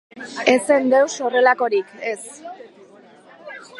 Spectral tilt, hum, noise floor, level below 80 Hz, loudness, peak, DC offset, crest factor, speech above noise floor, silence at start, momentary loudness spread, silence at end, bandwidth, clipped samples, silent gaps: -2.5 dB/octave; none; -47 dBFS; -72 dBFS; -18 LUFS; 0 dBFS; under 0.1%; 20 dB; 28 dB; 0.15 s; 21 LU; 0 s; 11.5 kHz; under 0.1%; none